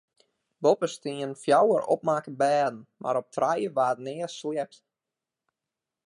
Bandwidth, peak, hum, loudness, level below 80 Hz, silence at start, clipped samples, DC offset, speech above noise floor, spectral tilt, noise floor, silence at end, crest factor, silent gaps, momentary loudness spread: 11.5 kHz; -8 dBFS; none; -27 LUFS; -80 dBFS; 0.6 s; under 0.1%; under 0.1%; 63 dB; -5 dB/octave; -89 dBFS; 1.4 s; 18 dB; none; 11 LU